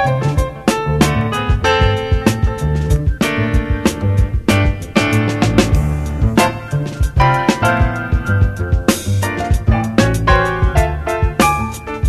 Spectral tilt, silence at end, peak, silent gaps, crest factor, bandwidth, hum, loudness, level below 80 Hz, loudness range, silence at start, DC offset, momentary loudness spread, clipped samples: -6 dB/octave; 0 s; 0 dBFS; none; 14 dB; 14 kHz; none; -16 LUFS; -20 dBFS; 1 LU; 0 s; under 0.1%; 5 LU; under 0.1%